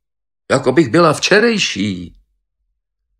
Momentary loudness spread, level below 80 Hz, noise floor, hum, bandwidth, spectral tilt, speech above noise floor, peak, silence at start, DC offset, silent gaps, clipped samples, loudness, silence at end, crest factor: 10 LU; -52 dBFS; -71 dBFS; none; 12.5 kHz; -4.5 dB/octave; 58 dB; 0 dBFS; 0.5 s; under 0.1%; none; under 0.1%; -14 LUFS; 1.1 s; 16 dB